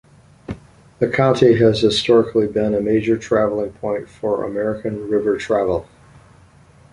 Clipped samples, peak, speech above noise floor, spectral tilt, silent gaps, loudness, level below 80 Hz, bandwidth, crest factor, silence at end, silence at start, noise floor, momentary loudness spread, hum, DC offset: under 0.1%; -2 dBFS; 31 dB; -6.5 dB/octave; none; -18 LUFS; -46 dBFS; 11 kHz; 18 dB; 1.1 s; 0.5 s; -48 dBFS; 11 LU; none; under 0.1%